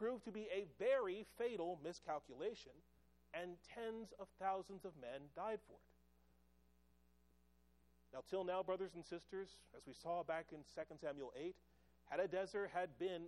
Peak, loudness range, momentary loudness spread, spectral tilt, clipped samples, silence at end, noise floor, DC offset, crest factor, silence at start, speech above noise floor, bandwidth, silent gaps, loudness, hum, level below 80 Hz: -28 dBFS; 7 LU; 11 LU; -5.5 dB/octave; under 0.1%; 0 s; -76 dBFS; under 0.1%; 20 dB; 0 s; 29 dB; 13 kHz; none; -47 LUFS; none; -78 dBFS